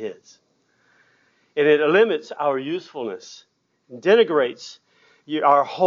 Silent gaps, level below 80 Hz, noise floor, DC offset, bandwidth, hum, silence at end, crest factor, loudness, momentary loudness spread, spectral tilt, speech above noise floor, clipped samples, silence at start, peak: none; -84 dBFS; -63 dBFS; under 0.1%; 7.2 kHz; none; 0 s; 20 dB; -20 LUFS; 19 LU; -5 dB/octave; 43 dB; under 0.1%; 0 s; -2 dBFS